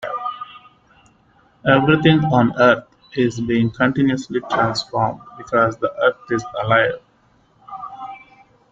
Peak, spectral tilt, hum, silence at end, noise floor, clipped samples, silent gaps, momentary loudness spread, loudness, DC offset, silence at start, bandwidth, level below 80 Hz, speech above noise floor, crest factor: -2 dBFS; -6.5 dB/octave; none; 0.55 s; -57 dBFS; under 0.1%; none; 20 LU; -18 LUFS; under 0.1%; 0 s; 7.8 kHz; -52 dBFS; 40 dB; 18 dB